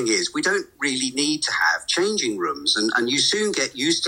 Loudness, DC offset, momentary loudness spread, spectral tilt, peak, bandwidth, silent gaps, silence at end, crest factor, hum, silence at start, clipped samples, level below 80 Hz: -21 LUFS; under 0.1%; 4 LU; -1.5 dB/octave; -6 dBFS; 16.5 kHz; none; 0 s; 16 dB; none; 0 s; under 0.1%; -62 dBFS